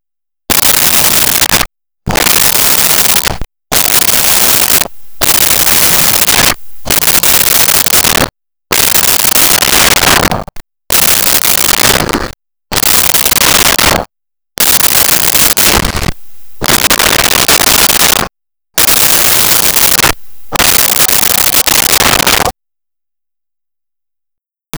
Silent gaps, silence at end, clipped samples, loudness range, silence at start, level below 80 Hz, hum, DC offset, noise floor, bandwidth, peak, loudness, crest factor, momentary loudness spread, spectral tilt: none; 0 s; under 0.1%; 2 LU; 0.5 s; -30 dBFS; none; under 0.1%; -88 dBFS; over 20 kHz; 0 dBFS; -6 LUFS; 10 dB; 10 LU; -1 dB/octave